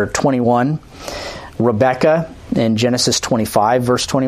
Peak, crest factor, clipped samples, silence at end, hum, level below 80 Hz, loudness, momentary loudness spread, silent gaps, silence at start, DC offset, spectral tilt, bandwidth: 0 dBFS; 16 dB; under 0.1%; 0 s; none; -44 dBFS; -16 LUFS; 12 LU; none; 0 s; under 0.1%; -4.5 dB/octave; 15.5 kHz